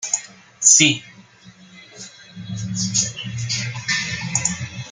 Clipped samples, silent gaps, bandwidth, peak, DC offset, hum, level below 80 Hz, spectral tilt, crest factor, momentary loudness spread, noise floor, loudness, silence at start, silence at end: under 0.1%; none; 10.5 kHz; 0 dBFS; under 0.1%; none; -56 dBFS; -1.5 dB/octave; 22 dB; 26 LU; -47 dBFS; -18 LUFS; 0 s; 0 s